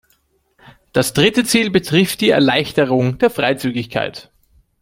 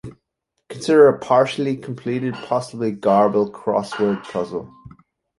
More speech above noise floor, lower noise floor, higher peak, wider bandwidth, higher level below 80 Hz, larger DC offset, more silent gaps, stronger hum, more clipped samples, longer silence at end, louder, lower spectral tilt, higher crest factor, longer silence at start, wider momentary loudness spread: second, 45 dB vs 57 dB; second, -61 dBFS vs -76 dBFS; about the same, 0 dBFS vs -2 dBFS; first, 16.5 kHz vs 11.5 kHz; first, -50 dBFS vs -58 dBFS; neither; neither; neither; neither; about the same, 0.6 s vs 0.5 s; first, -16 LUFS vs -19 LUFS; second, -4.5 dB/octave vs -6.5 dB/octave; about the same, 16 dB vs 18 dB; first, 0.95 s vs 0.05 s; second, 8 LU vs 13 LU